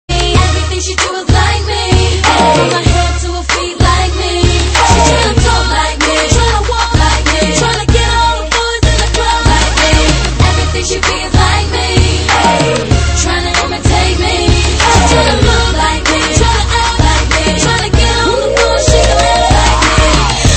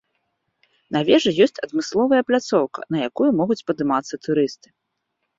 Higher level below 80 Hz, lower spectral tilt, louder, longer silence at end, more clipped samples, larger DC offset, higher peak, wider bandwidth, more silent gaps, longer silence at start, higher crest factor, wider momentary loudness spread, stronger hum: first, -14 dBFS vs -64 dBFS; second, -4 dB/octave vs -5.5 dB/octave; first, -10 LUFS vs -20 LUFS; second, 0 s vs 0.85 s; first, 0.3% vs under 0.1%; neither; about the same, 0 dBFS vs -2 dBFS; first, 8.8 kHz vs 7.8 kHz; neither; second, 0.1 s vs 0.9 s; second, 10 dB vs 20 dB; second, 4 LU vs 8 LU; neither